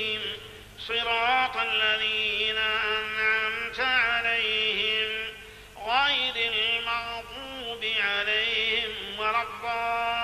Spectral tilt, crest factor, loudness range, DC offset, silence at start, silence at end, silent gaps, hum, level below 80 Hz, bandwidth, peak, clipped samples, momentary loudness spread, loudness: -2 dB/octave; 16 dB; 3 LU; under 0.1%; 0 s; 0 s; none; 50 Hz at -60 dBFS; -56 dBFS; 14.5 kHz; -12 dBFS; under 0.1%; 12 LU; -25 LUFS